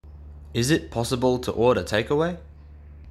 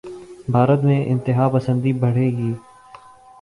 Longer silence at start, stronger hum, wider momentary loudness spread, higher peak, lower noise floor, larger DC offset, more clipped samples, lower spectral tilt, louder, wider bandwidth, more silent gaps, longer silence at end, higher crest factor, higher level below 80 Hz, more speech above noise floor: about the same, 0.05 s vs 0.05 s; neither; about the same, 15 LU vs 13 LU; second, -6 dBFS vs -2 dBFS; about the same, -44 dBFS vs -44 dBFS; neither; neither; second, -5.5 dB/octave vs -9.5 dB/octave; second, -24 LUFS vs -19 LUFS; first, 14.5 kHz vs 10.5 kHz; neither; second, 0 s vs 0.85 s; about the same, 18 dB vs 18 dB; first, -44 dBFS vs -54 dBFS; second, 22 dB vs 27 dB